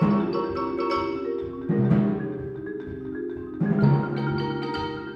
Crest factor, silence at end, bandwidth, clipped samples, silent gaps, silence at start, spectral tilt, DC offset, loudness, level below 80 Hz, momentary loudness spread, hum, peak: 18 dB; 0 s; 6.2 kHz; under 0.1%; none; 0 s; -9.5 dB/octave; under 0.1%; -26 LUFS; -50 dBFS; 12 LU; none; -8 dBFS